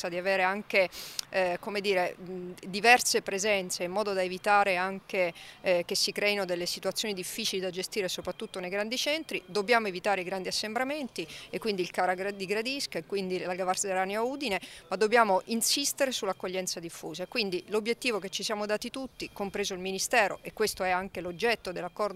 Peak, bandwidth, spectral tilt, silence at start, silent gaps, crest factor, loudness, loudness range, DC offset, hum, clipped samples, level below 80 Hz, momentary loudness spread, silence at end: -6 dBFS; 16 kHz; -2.5 dB/octave; 0 s; none; 24 dB; -29 LUFS; 5 LU; under 0.1%; none; under 0.1%; -66 dBFS; 10 LU; 0 s